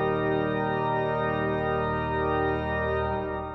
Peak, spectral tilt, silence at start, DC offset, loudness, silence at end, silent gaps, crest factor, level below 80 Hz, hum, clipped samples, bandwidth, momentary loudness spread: -14 dBFS; -9 dB/octave; 0 s; under 0.1%; -27 LUFS; 0 s; none; 12 dB; -42 dBFS; none; under 0.1%; 5.8 kHz; 2 LU